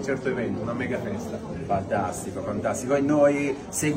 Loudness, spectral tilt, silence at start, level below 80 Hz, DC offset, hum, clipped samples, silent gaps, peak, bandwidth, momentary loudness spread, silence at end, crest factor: -26 LUFS; -5.5 dB/octave; 0 s; -52 dBFS; under 0.1%; none; under 0.1%; none; -8 dBFS; 16 kHz; 11 LU; 0 s; 16 dB